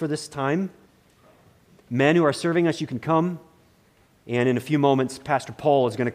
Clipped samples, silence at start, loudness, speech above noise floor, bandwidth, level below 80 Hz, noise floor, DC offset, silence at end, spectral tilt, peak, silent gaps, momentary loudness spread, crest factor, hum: under 0.1%; 0 s; -23 LUFS; 37 dB; 15 kHz; -64 dBFS; -59 dBFS; under 0.1%; 0 s; -6.5 dB/octave; -6 dBFS; none; 9 LU; 18 dB; none